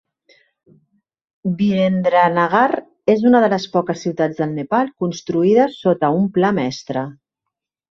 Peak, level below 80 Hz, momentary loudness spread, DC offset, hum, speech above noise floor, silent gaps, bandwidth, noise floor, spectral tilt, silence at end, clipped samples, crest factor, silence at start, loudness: -2 dBFS; -60 dBFS; 10 LU; under 0.1%; none; 65 dB; none; 7.4 kHz; -81 dBFS; -7 dB/octave; 0.8 s; under 0.1%; 16 dB; 1.45 s; -17 LUFS